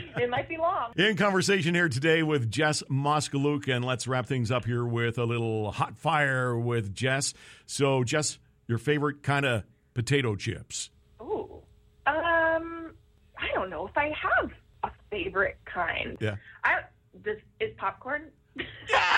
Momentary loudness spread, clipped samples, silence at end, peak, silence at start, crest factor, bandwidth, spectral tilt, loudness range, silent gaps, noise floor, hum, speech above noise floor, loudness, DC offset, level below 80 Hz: 12 LU; under 0.1%; 0 s; -8 dBFS; 0 s; 22 dB; 13.5 kHz; -4.5 dB/octave; 5 LU; none; -55 dBFS; none; 27 dB; -28 LUFS; under 0.1%; -56 dBFS